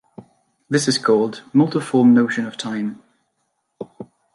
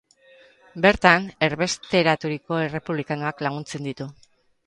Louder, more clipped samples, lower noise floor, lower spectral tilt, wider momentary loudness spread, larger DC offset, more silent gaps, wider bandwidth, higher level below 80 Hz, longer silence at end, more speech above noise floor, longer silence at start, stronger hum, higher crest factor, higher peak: first, -18 LUFS vs -22 LUFS; neither; first, -71 dBFS vs -54 dBFS; about the same, -5 dB/octave vs -5 dB/octave; first, 22 LU vs 15 LU; neither; neither; about the same, 11.5 kHz vs 11.5 kHz; second, -68 dBFS vs -52 dBFS; second, 0.3 s vs 0.55 s; first, 54 dB vs 31 dB; second, 0.2 s vs 0.75 s; neither; second, 16 dB vs 24 dB; second, -4 dBFS vs 0 dBFS